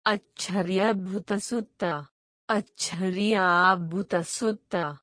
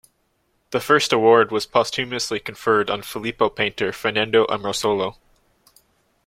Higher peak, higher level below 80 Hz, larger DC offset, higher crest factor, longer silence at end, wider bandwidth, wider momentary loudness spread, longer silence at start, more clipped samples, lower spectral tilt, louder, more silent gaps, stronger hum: second, -8 dBFS vs -2 dBFS; second, -68 dBFS vs -56 dBFS; neither; about the same, 20 dB vs 20 dB; second, 0.05 s vs 1.15 s; second, 10.5 kHz vs 16 kHz; about the same, 10 LU vs 10 LU; second, 0.05 s vs 0.7 s; neither; about the same, -4.5 dB/octave vs -3.5 dB/octave; second, -26 LUFS vs -20 LUFS; first, 2.11-2.48 s vs none; neither